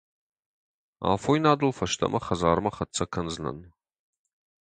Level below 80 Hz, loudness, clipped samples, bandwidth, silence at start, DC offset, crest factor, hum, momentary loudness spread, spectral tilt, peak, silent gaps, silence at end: -50 dBFS; -26 LUFS; under 0.1%; 9.6 kHz; 1 s; under 0.1%; 22 dB; none; 10 LU; -5 dB/octave; -6 dBFS; none; 1 s